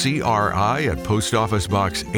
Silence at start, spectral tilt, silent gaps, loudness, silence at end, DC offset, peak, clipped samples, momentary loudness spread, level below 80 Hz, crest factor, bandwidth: 0 s; -5 dB/octave; none; -20 LUFS; 0 s; under 0.1%; -6 dBFS; under 0.1%; 2 LU; -38 dBFS; 14 dB; 19.5 kHz